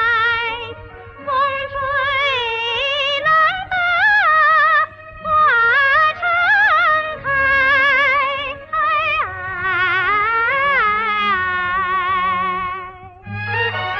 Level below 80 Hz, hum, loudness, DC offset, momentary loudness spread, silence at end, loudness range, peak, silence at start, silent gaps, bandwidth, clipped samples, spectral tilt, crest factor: -46 dBFS; none; -15 LUFS; under 0.1%; 11 LU; 0 s; 4 LU; -6 dBFS; 0 s; none; 7.2 kHz; under 0.1%; -4 dB/octave; 10 dB